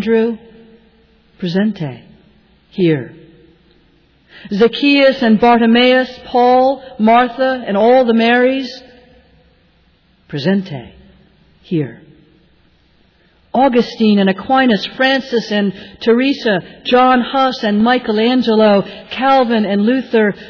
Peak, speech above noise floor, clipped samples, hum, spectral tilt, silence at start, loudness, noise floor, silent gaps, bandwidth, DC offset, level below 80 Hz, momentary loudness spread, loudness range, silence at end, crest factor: -2 dBFS; 40 dB; under 0.1%; none; -7 dB/octave; 0 s; -13 LUFS; -53 dBFS; none; 5.4 kHz; under 0.1%; -52 dBFS; 11 LU; 12 LU; 0 s; 12 dB